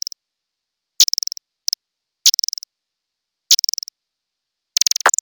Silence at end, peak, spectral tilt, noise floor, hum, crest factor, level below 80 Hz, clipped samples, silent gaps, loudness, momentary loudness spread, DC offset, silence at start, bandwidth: 0.1 s; 0 dBFS; 5 dB/octave; -81 dBFS; none; 22 dB; -76 dBFS; under 0.1%; none; -16 LUFS; 12 LU; under 0.1%; 1 s; 19.5 kHz